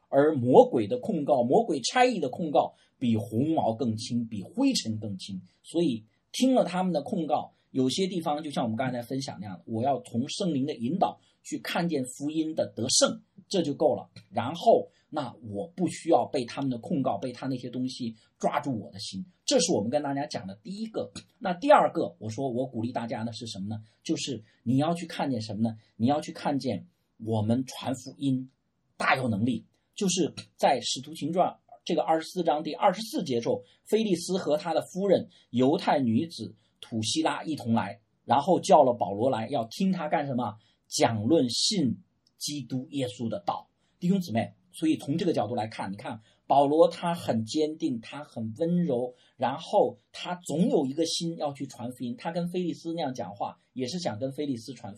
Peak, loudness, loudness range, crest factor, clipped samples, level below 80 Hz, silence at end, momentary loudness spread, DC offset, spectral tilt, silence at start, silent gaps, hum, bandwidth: -4 dBFS; -28 LUFS; 5 LU; 24 dB; under 0.1%; -74 dBFS; 0 s; 13 LU; under 0.1%; -5 dB/octave; 0.1 s; none; none; 13.5 kHz